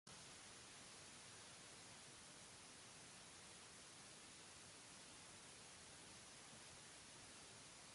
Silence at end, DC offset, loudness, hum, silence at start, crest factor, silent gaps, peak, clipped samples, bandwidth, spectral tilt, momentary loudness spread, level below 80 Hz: 0 s; under 0.1%; -59 LUFS; none; 0.05 s; 16 dB; none; -46 dBFS; under 0.1%; 11.5 kHz; -1.5 dB/octave; 1 LU; -82 dBFS